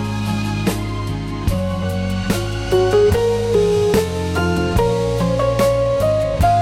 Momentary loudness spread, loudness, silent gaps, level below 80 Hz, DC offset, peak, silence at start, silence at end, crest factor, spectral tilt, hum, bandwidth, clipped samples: 6 LU; -18 LUFS; none; -30 dBFS; 0.1%; -4 dBFS; 0 s; 0 s; 12 dB; -6.5 dB/octave; none; 16.5 kHz; under 0.1%